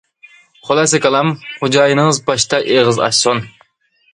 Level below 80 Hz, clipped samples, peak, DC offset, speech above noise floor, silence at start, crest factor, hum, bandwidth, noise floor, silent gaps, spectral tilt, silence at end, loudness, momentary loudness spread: -54 dBFS; under 0.1%; 0 dBFS; under 0.1%; 45 dB; 0.65 s; 16 dB; none; 11.5 kHz; -58 dBFS; none; -3.5 dB/octave; 0.65 s; -13 LUFS; 7 LU